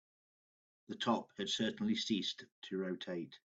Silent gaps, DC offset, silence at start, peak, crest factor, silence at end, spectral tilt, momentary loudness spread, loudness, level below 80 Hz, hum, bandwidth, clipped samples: 2.52-2.62 s; under 0.1%; 0.9 s; -20 dBFS; 20 dB; 0.15 s; -4 dB/octave; 9 LU; -39 LUFS; -80 dBFS; none; 8 kHz; under 0.1%